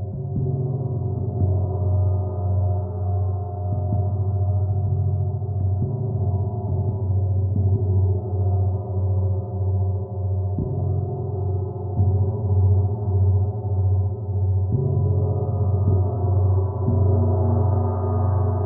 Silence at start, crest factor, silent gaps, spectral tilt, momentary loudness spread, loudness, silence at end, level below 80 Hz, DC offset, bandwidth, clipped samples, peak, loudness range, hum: 0 s; 12 dB; none; -16 dB/octave; 5 LU; -23 LUFS; 0 s; -48 dBFS; under 0.1%; 1.4 kHz; under 0.1%; -8 dBFS; 3 LU; none